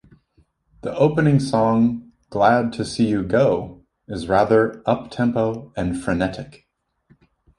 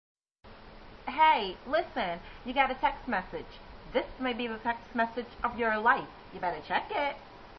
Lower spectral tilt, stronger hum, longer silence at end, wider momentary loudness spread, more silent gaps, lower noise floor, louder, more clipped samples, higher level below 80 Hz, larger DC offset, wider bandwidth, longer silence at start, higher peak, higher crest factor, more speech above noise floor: first, -7 dB/octave vs -1.5 dB/octave; neither; first, 1.1 s vs 0 s; about the same, 15 LU vs 17 LU; neither; first, -61 dBFS vs -50 dBFS; first, -20 LUFS vs -31 LUFS; neither; first, -46 dBFS vs -54 dBFS; neither; first, 11.5 kHz vs 6 kHz; first, 0.85 s vs 0.45 s; first, -2 dBFS vs -10 dBFS; about the same, 18 dB vs 20 dB; first, 42 dB vs 19 dB